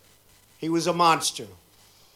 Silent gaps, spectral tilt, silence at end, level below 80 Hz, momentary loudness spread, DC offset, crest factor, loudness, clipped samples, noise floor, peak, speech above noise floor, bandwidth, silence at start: none; -3.5 dB/octave; 0.6 s; -66 dBFS; 18 LU; under 0.1%; 22 dB; -23 LUFS; under 0.1%; -57 dBFS; -6 dBFS; 33 dB; 16.5 kHz; 0.6 s